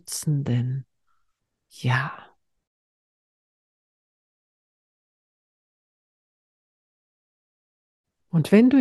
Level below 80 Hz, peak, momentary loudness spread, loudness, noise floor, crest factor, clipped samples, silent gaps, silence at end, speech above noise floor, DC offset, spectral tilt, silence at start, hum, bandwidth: -68 dBFS; -4 dBFS; 16 LU; -23 LUFS; -74 dBFS; 22 dB; under 0.1%; 2.67-8.04 s; 0 s; 53 dB; under 0.1%; -6.5 dB/octave; 0.1 s; none; 12.5 kHz